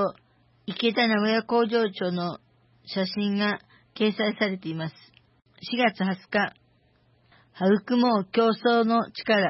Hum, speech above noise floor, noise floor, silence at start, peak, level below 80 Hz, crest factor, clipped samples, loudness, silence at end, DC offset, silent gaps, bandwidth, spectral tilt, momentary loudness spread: none; 39 dB; -63 dBFS; 0 s; -10 dBFS; -72 dBFS; 16 dB; under 0.1%; -25 LUFS; 0 s; under 0.1%; none; 5.8 kHz; -9.5 dB/octave; 12 LU